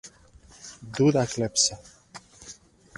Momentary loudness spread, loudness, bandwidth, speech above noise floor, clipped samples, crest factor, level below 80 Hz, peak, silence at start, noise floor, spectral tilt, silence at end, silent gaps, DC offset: 24 LU; -23 LUFS; 11.5 kHz; 29 dB; under 0.1%; 22 dB; -58 dBFS; -6 dBFS; 0.05 s; -53 dBFS; -4 dB/octave; 0.45 s; none; under 0.1%